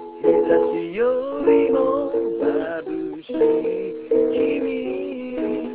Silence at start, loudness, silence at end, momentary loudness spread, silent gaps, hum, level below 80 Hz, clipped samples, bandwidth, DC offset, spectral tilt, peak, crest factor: 0 s; -21 LUFS; 0 s; 10 LU; none; none; -56 dBFS; under 0.1%; 4 kHz; 0.1%; -10 dB/octave; -6 dBFS; 16 dB